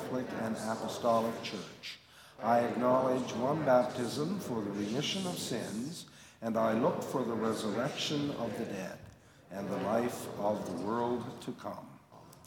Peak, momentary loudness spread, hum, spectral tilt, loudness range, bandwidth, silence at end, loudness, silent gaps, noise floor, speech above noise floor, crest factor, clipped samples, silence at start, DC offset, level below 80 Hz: -14 dBFS; 15 LU; none; -5 dB/octave; 5 LU; 18 kHz; 0.05 s; -34 LUFS; none; -56 dBFS; 22 dB; 20 dB; under 0.1%; 0 s; under 0.1%; -72 dBFS